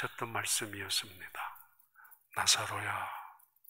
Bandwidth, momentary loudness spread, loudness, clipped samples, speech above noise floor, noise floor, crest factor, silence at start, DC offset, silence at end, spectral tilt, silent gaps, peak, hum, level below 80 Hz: 16 kHz; 17 LU; -33 LUFS; under 0.1%; 26 dB; -62 dBFS; 24 dB; 0 s; under 0.1%; 0.35 s; -0.5 dB/octave; none; -14 dBFS; none; -76 dBFS